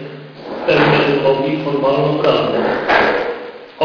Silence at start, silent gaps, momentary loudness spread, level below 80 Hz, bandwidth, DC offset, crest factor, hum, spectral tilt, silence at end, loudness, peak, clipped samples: 0 s; none; 17 LU; -48 dBFS; 5.4 kHz; under 0.1%; 16 dB; none; -7 dB/octave; 0 s; -15 LUFS; 0 dBFS; under 0.1%